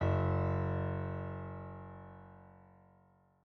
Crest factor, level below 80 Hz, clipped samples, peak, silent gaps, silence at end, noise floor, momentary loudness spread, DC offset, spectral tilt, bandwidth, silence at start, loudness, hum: 16 dB; -62 dBFS; under 0.1%; -22 dBFS; none; 0.85 s; -68 dBFS; 22 LU; under 0.1%; -8.5 dB/octave; 4.2 kHz; 0 s; -37 LUFS; none